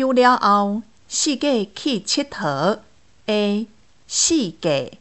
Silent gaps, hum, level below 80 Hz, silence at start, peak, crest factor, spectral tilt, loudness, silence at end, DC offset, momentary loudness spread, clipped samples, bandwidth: none; none; -60 dBFS; 0 s; -2 dBFS; 18 dB; -3 dB/octave; -20 LUFS; 0.05 s; 0.3%; 11 LU; under 0.1%; 8.6 kHz